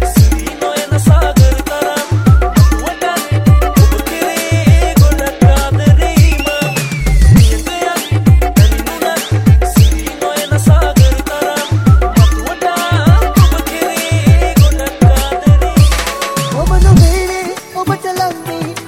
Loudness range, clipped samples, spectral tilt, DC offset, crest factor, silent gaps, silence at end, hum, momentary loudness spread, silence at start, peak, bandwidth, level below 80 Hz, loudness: 1 LU; 0.4%; -5.5 dB/octave; under 0.1%; 10 dB; none; 0 s; none; 7 LU; 0 s; 0 dBFS; 17 kHz; -14 dBFS; -11 LUFS